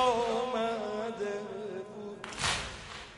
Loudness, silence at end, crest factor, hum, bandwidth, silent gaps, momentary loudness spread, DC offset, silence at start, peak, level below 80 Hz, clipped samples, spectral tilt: -34 LUFS; 0 s; 18 dB; none; 11.5 kHz; none; 11 LU; under 0.1%; 0 s; -16 dBFS; -56 dBFS; under 0.1%; -3 dB/octave